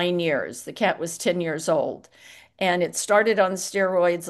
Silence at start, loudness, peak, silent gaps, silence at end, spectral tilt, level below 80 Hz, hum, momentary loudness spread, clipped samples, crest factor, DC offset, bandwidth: 0 s; -23 LUFS; -6 dBFS; none; 0 s; -4 dB/octave; -72 dBFS; none; 7 LU; under 0.1%; 18 dB; under 0.1%; 12.5 kHz